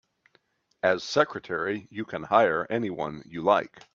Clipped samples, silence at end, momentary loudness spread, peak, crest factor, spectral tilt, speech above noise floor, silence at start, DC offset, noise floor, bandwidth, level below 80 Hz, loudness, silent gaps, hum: under 0.1%; 0.15 s; 12 LU; -6 dBFS; 22 dB; -5 dB/octave; 41 dB; 0.85 s; under 0.1%; -68 dBFS; 7.6 kHz; -68 dBFS; -27 LUFS; none; none